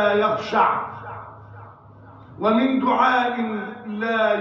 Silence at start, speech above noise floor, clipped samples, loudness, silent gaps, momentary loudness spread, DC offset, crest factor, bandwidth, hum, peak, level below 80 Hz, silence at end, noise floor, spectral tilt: 0 s; 25 dB; under 0.1%; -21 LUFS; none; 18 LU; under 0.1%; 16 dB; 7.2 kHz; none; -6 dBFS; -62 dBFS; 0 s; -45 dBFS; -6.5 dB/octave